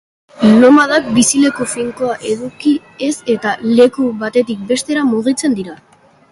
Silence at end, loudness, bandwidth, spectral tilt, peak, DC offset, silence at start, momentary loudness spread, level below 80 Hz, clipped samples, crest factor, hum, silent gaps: 0.55 s; -13 LUFS; 11.5 kHz; -4 dB/octave; 0 dBFS; under 0.1%; 0.35 s; 11 LU; -54 dBFS; under 0.1%; 14 dB; none; none